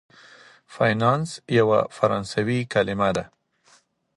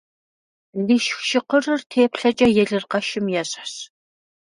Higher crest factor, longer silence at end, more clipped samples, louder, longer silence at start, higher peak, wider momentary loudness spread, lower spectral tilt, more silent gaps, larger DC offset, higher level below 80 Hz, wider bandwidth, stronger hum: about the same, 20 dB vs 18 dB; first, 0.9 s vs 0.7 s; neither; about the same, -22 LUFS vs -20 LUFS; about the same, 0.7 s vs 0.75 s; about the same, -4 dBFS vs -4 dBFS; second, 5 LU vs 14 LU; first, -6 dB/octave vs -4 dB/octave; second, none vs 1.86-1.90 s; neither; about the same, -56 dBFS vs -58 dBFS; about the same, 11.5 kHz vs 11 kHz; neither